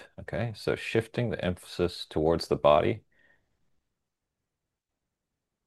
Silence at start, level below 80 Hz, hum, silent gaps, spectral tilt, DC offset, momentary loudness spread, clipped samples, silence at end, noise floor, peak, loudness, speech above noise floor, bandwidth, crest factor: 0 s; -54 dBFS; none; none; -6.5 dB/octave; under 0.1%; 11 LU; under 0.1%; 2.65 s; -86 dBFS; -8 dBFS; -29 LUFS; 58 dB; 12.5 kHz; 22 dB